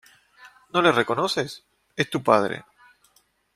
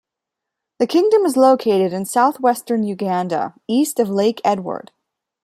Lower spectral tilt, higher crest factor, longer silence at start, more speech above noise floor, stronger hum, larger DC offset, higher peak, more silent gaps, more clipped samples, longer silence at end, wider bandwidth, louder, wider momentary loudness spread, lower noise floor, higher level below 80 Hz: about the same, -4.5 dB/octave vs -5.5 dB/octave; first, 24 dB vs 16 dB; second, 0.45 s vs 0.8 s; second, 42 dB vs 66 dB; neither; neither; about the same, -2 dBFS vs -2 dBFS; neither; neither; first, 0.95 s vs 0.65 s; about the same, 15.5 kHz vs 15.5 kHz; second, -23 LUFS vs -17 LUFS; first, 16 LU vs 9 LU; second, -64 dBFS vs -83 dBFS; about the same, -64 dBFS vs -68 dBFS